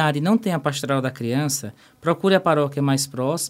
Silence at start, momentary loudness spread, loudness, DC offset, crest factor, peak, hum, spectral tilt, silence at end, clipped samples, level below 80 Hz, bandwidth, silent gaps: 0 s; 6 LU; -21 LUFS; under 0.1%; 18 dB; -4 dBFS; none; -5 dB/octave; 0 s; under 0.1%; -64 dBFS; 16 kHz; none